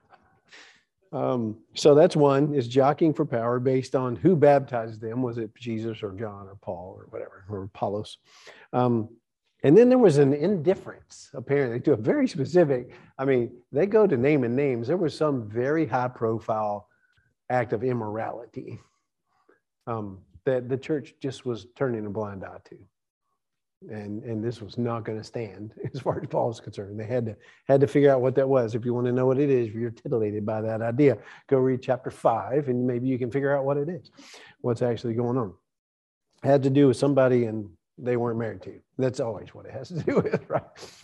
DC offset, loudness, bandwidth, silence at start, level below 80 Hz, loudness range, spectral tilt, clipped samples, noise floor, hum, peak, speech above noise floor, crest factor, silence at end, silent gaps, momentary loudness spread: under 0.1%; -25 LUFS; 11 kHz; 0.55 s; -66 dBFS; 11 LU; -7.5 dB/octave; under 0.1%; -82 dBFS; none; -6 dBFS; 57 dB; 20 dB; 0.15 s; 23.10-23.21 s, 23.77-23.81 s, 35.79-36.21 s; 17 LU